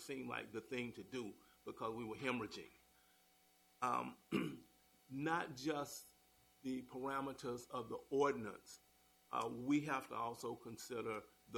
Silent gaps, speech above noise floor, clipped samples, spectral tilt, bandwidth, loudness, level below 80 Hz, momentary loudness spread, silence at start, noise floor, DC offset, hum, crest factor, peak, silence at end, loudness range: none; 29 dB; under 0.1%; -5 dB/octave; 19 kHz; -44 LUFS; -78 dBFS; 14 LU; 0 s; -73 dBFS; under 0.1%; none; 20 dB; -24 dBFS; 0 s; 4 LU